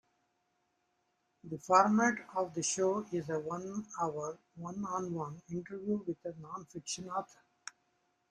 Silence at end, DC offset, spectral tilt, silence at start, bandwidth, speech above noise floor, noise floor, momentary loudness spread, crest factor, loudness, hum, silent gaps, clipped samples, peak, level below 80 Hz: 0.6 s; under 0.1%; -4.5 dB/octave; 1.45 s; 11 kHz; 44 dB; -79 dBFS; 18 LU; 24 dB; -35 LUFS; none; none; under 0.1%; -12 dBFS; -76 dBFS